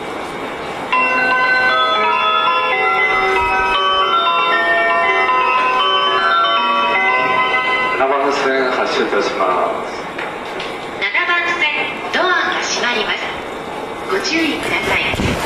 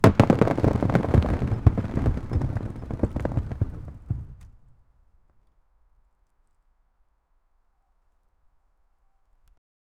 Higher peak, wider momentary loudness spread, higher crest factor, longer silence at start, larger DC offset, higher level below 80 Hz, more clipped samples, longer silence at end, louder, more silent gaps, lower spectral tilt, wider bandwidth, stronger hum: about the same, -4 dBFS vs -2 dBFS; second, 11 LU vs 15 LU; second, 12 dB vs 24 dB; about the same, 0 s vs 0 s; neither; second, -44 dBFS vs -36 dBFS; neither; second, 0 s vs 5.5 s; first, -15 LUFS vs -25 LUFS; neither; second, -3 dB/octave vs -8.5 dB/octave; about the same, 14 kHz vs 15 kHz; neither